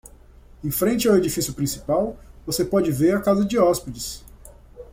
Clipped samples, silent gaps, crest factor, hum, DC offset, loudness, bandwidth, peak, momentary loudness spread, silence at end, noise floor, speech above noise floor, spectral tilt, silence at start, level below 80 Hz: under 0.1%; none; 16 dB; none; under 0.1%; -22 LUFS; 16.5 kHz; -6 dBFS; 13 LU; 0.1 s; -47 dBFS; 26 dB; -5 dB/octave; 0.6 s; -44 dBFS